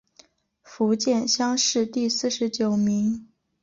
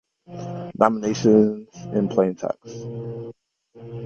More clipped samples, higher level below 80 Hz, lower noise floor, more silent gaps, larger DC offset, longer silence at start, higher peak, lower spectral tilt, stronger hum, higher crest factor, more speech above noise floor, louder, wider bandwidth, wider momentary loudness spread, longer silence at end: neither; second, -66 dBFS vs -60 dBFS; first, -58 dBFS vs -44 dBFS; neither; neither; first, 0.7 s vs 0.3 s; second, -10 dBFS vs 0 dBFS; second, -3.5 dB/octave vs -7 dB/octave; neither; second, 14 dB vs 22 dB; first, 34 dB vs 23 dB; about the same, -23 LUFS vs -22 LUFS; about the same, 7.6 kHz vs 7 kHz; second, 5 LU vs 19 LU; first, 0.4 s vs 0 s